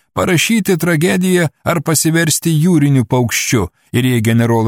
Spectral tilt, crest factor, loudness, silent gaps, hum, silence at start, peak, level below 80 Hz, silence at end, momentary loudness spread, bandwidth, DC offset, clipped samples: -5 dB/octave; 12 dB; -13 LUFS; none; none; 0.15 s; -2 dBFS; -46 dBFS; 0 s; 4 LU; 17.5 kHz; under 0.1%; under 0.1%